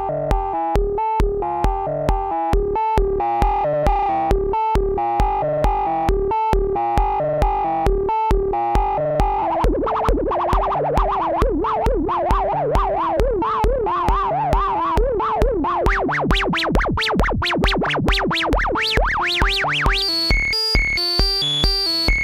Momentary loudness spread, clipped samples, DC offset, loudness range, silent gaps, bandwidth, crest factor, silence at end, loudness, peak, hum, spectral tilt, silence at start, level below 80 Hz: 4 LU; under 0.1%; under 0.1%; 2 LU; none; 15.5 kHz; 18 dB; 0 s; -19 LUFS; 0 dBFS; none; -5 dB/octave; 0 s; -24 dBFS